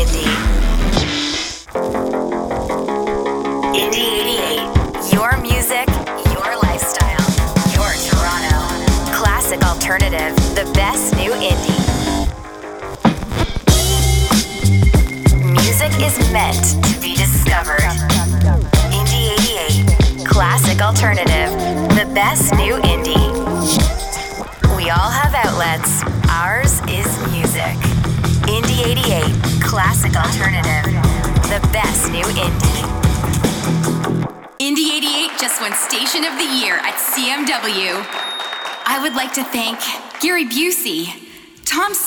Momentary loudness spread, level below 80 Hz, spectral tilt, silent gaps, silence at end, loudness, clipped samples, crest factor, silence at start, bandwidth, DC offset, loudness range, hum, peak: 6 LU; -22 dBFS; -4 dB/octave; none; 0 s; -16 LUFS; under 0.1%; 16 dB; 0 s; over 20 kHz; under 0.1%; 4 LU; none; 0 dBFS